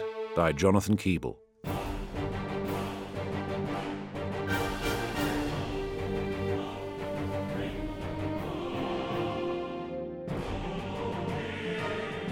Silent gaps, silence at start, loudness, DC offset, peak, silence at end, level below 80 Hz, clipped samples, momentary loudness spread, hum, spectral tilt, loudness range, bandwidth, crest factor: none; 0 s; -33 LUFS; under 0.1%; -10 dBFS; 0 s; -46 dBFS; under 0.1%; 8 LU; none; -6 dB/octave; 3 LU; 16.5 kHz; 22 dB